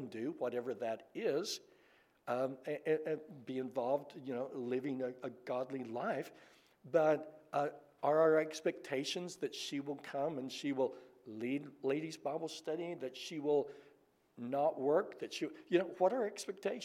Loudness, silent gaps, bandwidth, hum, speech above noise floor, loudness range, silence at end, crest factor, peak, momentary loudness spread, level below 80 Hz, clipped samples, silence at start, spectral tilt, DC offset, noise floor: -38 LUFS; none; 15.5 kHz; none; 32 dB; 5 LU; 0 s; 20 dB; -18 dBFS; 10 LU; -90 dBFS; under 0.1%; 0 s; -5 dB/octave; under 0.1%; -69 dBFS